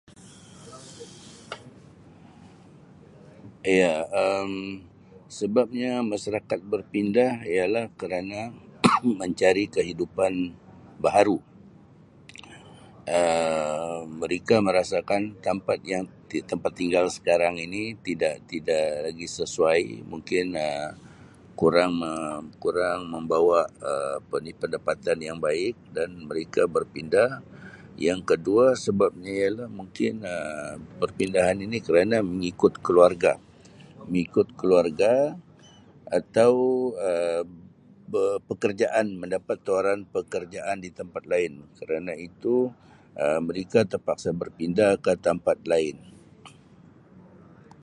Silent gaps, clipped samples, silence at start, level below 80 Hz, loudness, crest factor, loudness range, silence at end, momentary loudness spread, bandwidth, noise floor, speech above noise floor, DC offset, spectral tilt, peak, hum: none; under 0.1%; 0.2 s; -58 dBFS; -25 LUFS; 24 dB; 5 LU; 0.6 s; 13 LU; 11.5 kHz; -53 dBFS; 28 dB; under 0.1%; -5.5 dB/octave; 0 dBFS; none